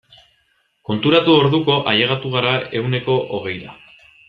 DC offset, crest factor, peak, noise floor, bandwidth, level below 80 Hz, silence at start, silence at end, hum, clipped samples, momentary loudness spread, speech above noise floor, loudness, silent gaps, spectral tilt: under 0.1%; 18 dB; -2 dBFS; -63 dBFS; 5.6 kHz; -56 dBFS; 0.9 s; 0.55 s; none; under 0.1%; 14 LU; 46 dB; -17 LUFS; none; -8 dB/octave